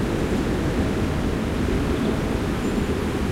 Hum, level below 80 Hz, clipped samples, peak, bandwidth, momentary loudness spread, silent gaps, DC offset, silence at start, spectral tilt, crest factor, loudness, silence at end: none; -30 dBFS; under 0.1%; -10 dBFS; 16 kHz; 1 LU; none; under 0.1%; 0 s; -6.5 dB/octave; 12 dB; -24 LUFS; 0 s